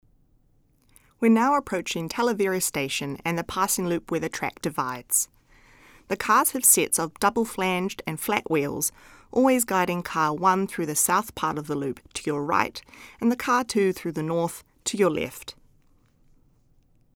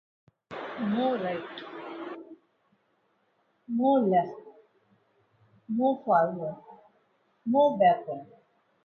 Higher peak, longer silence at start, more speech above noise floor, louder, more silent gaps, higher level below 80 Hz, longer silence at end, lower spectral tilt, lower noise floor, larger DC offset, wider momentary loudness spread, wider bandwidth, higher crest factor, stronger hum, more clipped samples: first, -4 dBFS vs -10 dBFS; first, 1.2 s vs 0.5 s; second, 38 dB vs 46 dB; first, -24 LUFS vs -27 LUFS; neither; first, -58 dBFS vs -78 dBFS; first, 1.65 s vs 0.6 s; second, -3.5 dB/octave vs -9 dB/octave; second, -63 dBFS vs -71 dBFS; neither; second, 10 LU vs 17 LU; first, over 20 kHz vs 6.4 kHz; about the same, 22 dB vs 20 dB; neither; neither